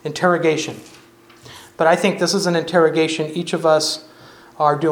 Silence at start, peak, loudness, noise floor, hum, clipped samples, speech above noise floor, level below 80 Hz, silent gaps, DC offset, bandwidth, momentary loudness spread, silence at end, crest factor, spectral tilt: 0.05 s; 0 dBFS; -18 LUFS; -44 dBFS; none; under 0.1%; 27 dB; -66 dBFS; none; under 0.1%; 17.5 kHz; 10 LU; 0 s; 18 dB; -4.5 dB/octave